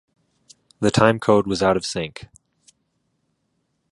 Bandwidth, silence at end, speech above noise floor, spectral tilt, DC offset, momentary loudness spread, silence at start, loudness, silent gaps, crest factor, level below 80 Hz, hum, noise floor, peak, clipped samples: 11.5 kHz; 1.65 s; 53 dB; -5.5 dB/octave; under 0.1%; 13 LU; 0.8 s; -19 LUFS; none; 22 dB; -50 dBFS; none; -71 dBFS; 0 dBFS; under 0.1%